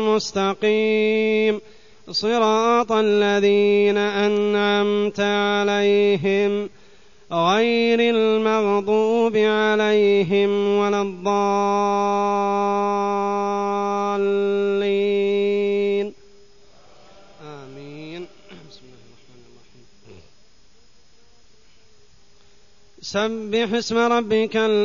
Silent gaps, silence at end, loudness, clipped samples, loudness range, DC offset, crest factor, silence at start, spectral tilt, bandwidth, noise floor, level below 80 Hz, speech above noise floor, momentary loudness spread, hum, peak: none; 0 s; -20 LUFS; under 0.1%; 14 LU; 0.4%; 14 dB; 0 s; -5 dB/octave; 7.4 kHz; -57 dBFS; -62 dBFS; 38 dB; 9 LU; none; -6 dBFS